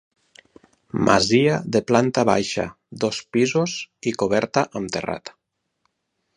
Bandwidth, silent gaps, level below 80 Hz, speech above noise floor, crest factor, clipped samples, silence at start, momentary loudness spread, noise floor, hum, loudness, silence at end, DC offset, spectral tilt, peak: 11 kHz; none; -54 dBFS; 54 dB; 22 dB; under 0.1%; 0.95 s; 11 LU; -75 dBFS; none; -21 LUFS; 1.05 s; under 0.1%; -5 dB/octave; 0 dBFS